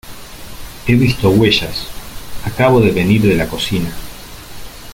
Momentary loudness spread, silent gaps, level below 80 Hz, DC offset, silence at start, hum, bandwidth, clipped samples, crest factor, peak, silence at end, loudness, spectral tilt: 22 LU; none; -34 dBFS; under 0.1%; 0.05 s; none; 17 kHz; under 0.1%; 14 dB; 0 dBFS; 0 s; -14 LUFS; -6 dB/octave